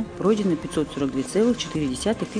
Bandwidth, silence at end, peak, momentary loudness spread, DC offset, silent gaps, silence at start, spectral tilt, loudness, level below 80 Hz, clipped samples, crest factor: 10 kHz; 0 s; -8 dBFS; 4 LU; under 0.1%; none; 0 s; -5.5 dB/octave; -24 LUFS; -48 dBFS; under 0.1%; 16 dB